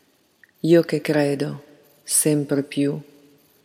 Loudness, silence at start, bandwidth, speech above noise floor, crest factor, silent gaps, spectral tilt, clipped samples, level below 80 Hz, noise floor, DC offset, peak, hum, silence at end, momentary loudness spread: -21 LUFS; 0.65 s; 16.5 kHz; 38 dB; 20 dB; none; -5 dB/octave; under 0.1%; -74 dBFS; -58 dBFS; under 0.1%; -4 dBFS; none; 0.6 s; 14 LU